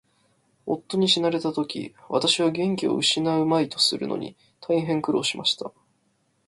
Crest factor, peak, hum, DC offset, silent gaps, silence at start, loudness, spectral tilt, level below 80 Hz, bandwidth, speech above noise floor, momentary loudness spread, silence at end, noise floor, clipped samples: 18 dB; -6 dBFS; none; under 0.1%; none; 0.65 s; -23 LUFS; -4 dB/octave; -66 dBFS; 11.5 kHz; 45 dB; 12 LU; 0.8 s; -69 dBFS; under 0.1%